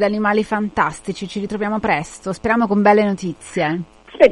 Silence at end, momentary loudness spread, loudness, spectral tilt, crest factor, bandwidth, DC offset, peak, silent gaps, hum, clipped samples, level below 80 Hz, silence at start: 0 s; 12 LU; -19 LUFS; -6 dB/octave; 18 dB; 11.5 kHz; under 0.1%; 0 dBFS; none; none; under 0.1%; -48 dBFS; 0 s